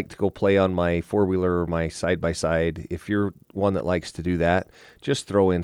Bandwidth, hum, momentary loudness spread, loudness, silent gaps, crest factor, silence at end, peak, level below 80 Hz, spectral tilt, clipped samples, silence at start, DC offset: 13 kHz; none; 7 LU; -24 LUFS; none; 16 dB; 0 s; -8 dBFS; -44 dBFS; -6.5 dB/octave; under 0.1%; 0 s; under 0.1%